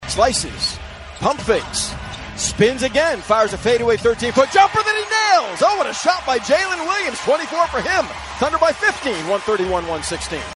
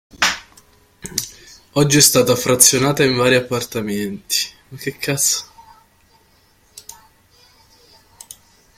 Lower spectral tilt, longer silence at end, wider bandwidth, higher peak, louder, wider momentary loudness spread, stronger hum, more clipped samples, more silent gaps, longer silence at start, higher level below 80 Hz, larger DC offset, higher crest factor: about the same, -3 dB/octave vs -2.5 dB/octave; second, 0 s vs 1.85 s; second, 12 kHz vs 16.5 kHz; about the same, 0 dBFS vs 0 dBFS; about the same, -18 LUFS vs -16 LUFS; second, 8 LU vs 18 LU; neither; neither; neither; second, 0 s vs 0.2 s; first, -40 dBFS vs -52 dBFS; neither; about the same, 18 dB vs 20 dB